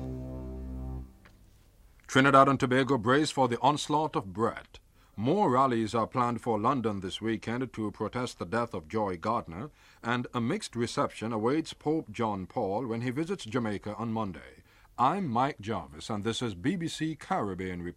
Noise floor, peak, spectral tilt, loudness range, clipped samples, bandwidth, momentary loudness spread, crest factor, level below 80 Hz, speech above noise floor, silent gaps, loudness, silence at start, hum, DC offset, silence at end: -58 dBFS; -6 dBFS; -5.5 dB/octave; 7 LU; under 0.1%; 13.5 kHz; 14 LU; 24 dB; -52 dBFS; 29 dB; none; -30 LUFS; 0 s; none; under 0.1%; 0.05 s